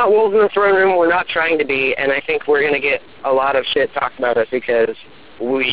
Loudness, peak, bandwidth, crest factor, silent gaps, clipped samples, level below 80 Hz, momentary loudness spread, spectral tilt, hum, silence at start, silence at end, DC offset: -16 LUFS; -4 dBFS; 4 kHz; 12 dB; none; under 0.1%; -54 dBFS; 6 LU; -7.5 dB/octave; none; 0 s; 0 s; 0.8%